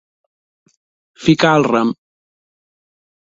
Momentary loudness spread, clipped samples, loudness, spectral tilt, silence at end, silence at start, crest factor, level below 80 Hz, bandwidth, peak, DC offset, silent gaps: 9 LU; under 0.1%; -15 LUFS; -6 dB/octave; 1.4 s; 1.2 s; 20 dB; -56 dBFS; 7.8 kHz; 0 dBFS; under 0.1%; none